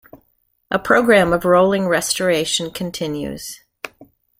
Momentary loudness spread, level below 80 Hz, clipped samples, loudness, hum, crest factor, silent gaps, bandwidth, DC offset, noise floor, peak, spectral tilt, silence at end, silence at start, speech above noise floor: 19 LU; -48 dBFS; under 0.1%; -17 LUFS; none; 18 dB; none; 16.5 kHz; under 0.1%; -65 dBFS; 0 dBFS; -4 dB/octave; 0.35 s; 0.15 s; 48 dB